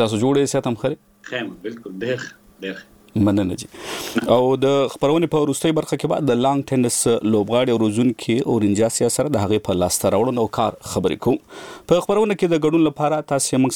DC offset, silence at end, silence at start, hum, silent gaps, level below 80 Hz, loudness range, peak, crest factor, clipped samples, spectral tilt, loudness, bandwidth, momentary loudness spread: under 0.1%; 0 s; 0 s; none; none; -52 dBFS; 6 LU; -2 dBFS; 18 dB; under 0.1%; -5 dB/octave; -19 LUFS; 19 kHz; 12 LU